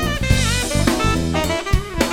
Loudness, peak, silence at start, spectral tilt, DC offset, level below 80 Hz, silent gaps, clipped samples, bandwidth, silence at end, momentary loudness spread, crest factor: -19 LUFS; 0 dBFS; 0 s; -4.5 dB/octave; under 0.1%; -24 dBFS; none; under 0.1%; 18.5 kHz; 0 s; 3 LU; 18 dB